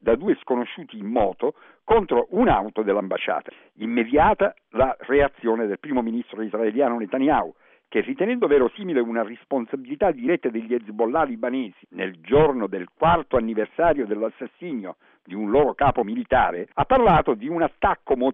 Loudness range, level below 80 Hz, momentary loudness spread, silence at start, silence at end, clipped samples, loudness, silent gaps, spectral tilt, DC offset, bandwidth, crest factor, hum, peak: 2 LU; -42 dBFS; 12 LU; 0.05 s; 0 s; under 0.1%; -22 LUFS; none; -9.5 dB/octave; under 0.1%; 3.9 kHz; 16 dB; none; -6 dBFS